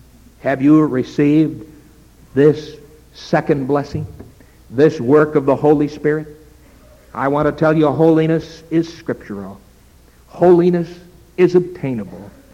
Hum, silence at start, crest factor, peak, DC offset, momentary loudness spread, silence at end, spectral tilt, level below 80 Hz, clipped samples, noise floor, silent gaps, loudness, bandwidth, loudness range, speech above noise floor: none; 0.45 s; 16 dB; 0 dBFS; under 0.1%; 18 LU; 0.25 s; -8.5 dB/octave; -46 dBFS; under 0.1%; -47 dBFS; none; -16 LUFS; 9.2 kHz; 2 LU; 32 dB